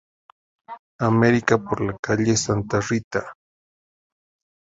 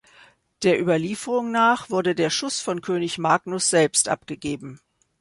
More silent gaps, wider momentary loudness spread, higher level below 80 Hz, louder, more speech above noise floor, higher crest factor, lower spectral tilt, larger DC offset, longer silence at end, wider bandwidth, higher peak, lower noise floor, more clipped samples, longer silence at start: first, 0.79-0.99 s, 1.99-2.03 s, 3.04-3.11 s vs none; first, 24 LU vs 10 LU; first, -50 dBFS vs -62 dBFS; about the same, -21 LUFS vs -22 LUFS; first, over 69 dB vs 32 dB; about the same, 22 dB vs 18 dB; first, -5.5 dB/octave vs -3.5 dB/octave; neither; first, 1.35 s vs 0.45 s; second, 7.8 kHz vs 11.5 kHz; about the same, -2 dBFS vs -4 dBFS; first, under -90 dBFS vs -54 dBFS; neither; about the same, 0.7 s vs 0.6 s